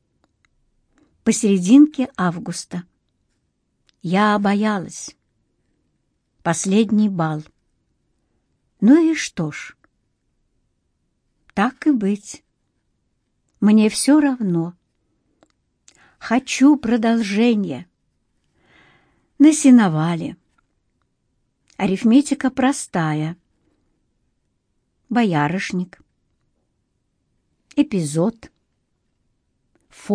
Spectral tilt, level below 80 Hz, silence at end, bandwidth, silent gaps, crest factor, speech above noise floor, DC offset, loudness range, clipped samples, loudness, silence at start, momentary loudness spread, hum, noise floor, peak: -5.5 dB/octave; -60 dBFS; 0 s; 10.5 kHz; none; 18 dB; 53 dB; under 0.1%; 7 LU; under 0.1%; -18 LUFS; 1.25 s; 17 LU; none; -70 dBFS; -2 dBFS